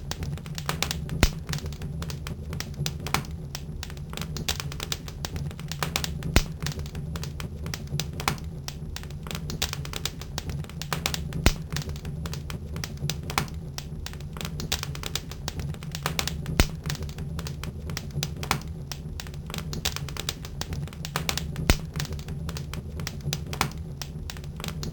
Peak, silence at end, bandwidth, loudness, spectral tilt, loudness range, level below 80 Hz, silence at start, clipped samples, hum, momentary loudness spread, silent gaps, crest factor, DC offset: 0 dBFS; 0 s; 20 kHz; -31 LUFS; -4 dB/octave; 2 LU; -36 dBFS; 0 s; under 0.1%; none; 10 LU; none; 30 dB; under 0.1%